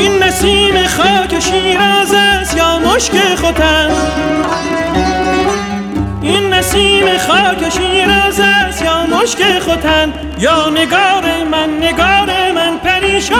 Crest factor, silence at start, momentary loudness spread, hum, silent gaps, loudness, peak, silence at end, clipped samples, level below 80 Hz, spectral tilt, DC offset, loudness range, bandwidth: 10 dB; 0 s; 5 LU; none; none; -11 LUFS; -2 dBFS; 0 s; under 0.1%; -28 dBFS; -3 dB/octave; under 0.1%; 3 LU; 18 kHz